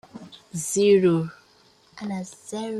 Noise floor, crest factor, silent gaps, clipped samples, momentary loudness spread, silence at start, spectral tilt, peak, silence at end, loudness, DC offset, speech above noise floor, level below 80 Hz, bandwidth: -58 dBFS; 16 dB; none; under 0.1%; 20 LU; 0.15 s; -5.5 dB/octave; -8 dBFS; 0 s; -23 LUFS; under 0.1%; 35 dB; -66 dBFS; 13 kHz